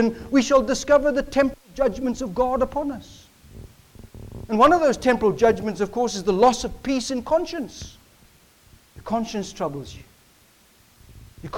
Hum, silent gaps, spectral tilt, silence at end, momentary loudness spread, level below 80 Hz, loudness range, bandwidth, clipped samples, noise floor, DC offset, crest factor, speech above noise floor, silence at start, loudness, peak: none; none; -5 dB/octave; 0 s; 19 LU; -44 dBFS; 12 LU; 18 kHz; under 0.1%; -56 dBFS; under 0.1%; 18 dB; 35 dB; 0 s; -22 LUFS; -6 dBFS